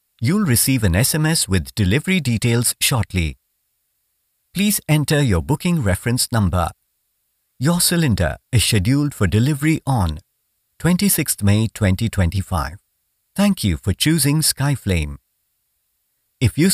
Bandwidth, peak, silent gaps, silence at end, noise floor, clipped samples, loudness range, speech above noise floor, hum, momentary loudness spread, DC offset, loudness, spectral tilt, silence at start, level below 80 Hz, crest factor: 16 kHz; -2 dBFS; none; 0 s; -70 dBFS; under 0.1%; 2 LU; 52 dB; none; 7 LU; under 0.1%; -18 LUFS; -4.5 dB/octave; 0.2 s; -36 dBFS; 18 dB